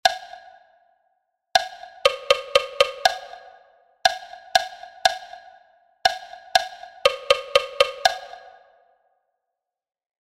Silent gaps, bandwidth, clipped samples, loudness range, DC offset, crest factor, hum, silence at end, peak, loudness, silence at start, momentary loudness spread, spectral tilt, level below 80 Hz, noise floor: none; 16 kHz; under 0.1%; 2 LU; under 0.1%; 24 dB; none; 1.85 s; 0 dBFS; -22 LUFS; 0.05 s; 16 LU; 0.5 dB/octave; -58 dBFS; -84 dBFS